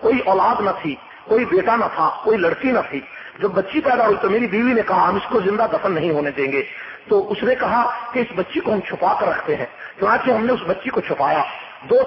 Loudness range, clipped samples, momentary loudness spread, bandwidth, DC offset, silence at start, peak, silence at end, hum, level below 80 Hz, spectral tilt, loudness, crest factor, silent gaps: 2 LU; under 0.1%; 8 LU; 5.8 kHz; under 0.1%; 0 s; -4 dBFS; 0 s; none; -54 dBFS; -10.5 dB/octave; -19 LUFS; 14 dB; none